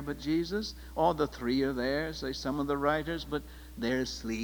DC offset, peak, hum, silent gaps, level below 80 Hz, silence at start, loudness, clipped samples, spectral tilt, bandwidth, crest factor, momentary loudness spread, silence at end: under 0.1%; -14 dBFS; none; none; -48 dBFS; 0 s; -32 LUFS; under 0.1%; -5.5 dB/octave; over 20 kHz; 18 dB; 7 LU; 0 s